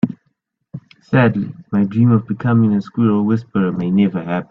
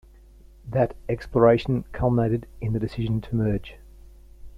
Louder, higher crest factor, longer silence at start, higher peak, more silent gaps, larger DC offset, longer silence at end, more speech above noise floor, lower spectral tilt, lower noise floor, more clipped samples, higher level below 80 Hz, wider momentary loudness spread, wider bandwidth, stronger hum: first, -17 LUFS vs -24 LUFS; about the same, 16 dB vs 20 dB; second, 0.05 s vs 0.65 s; first, 0 dBFS vs -4 dBFS; neither; neither; about the same, 0.05 s vs 0 s; first, 52 dB vs 26 dB; about the same, -10.5 dB/octave vs -9.5 dB/octave; first, -68 dBFS vs -49 dBFS; neither; second, -54 dBFS vs -42 dBFS; first, 22 LU vs 11 LU; second, 5.4 kHz vs 6.2 kHz; neither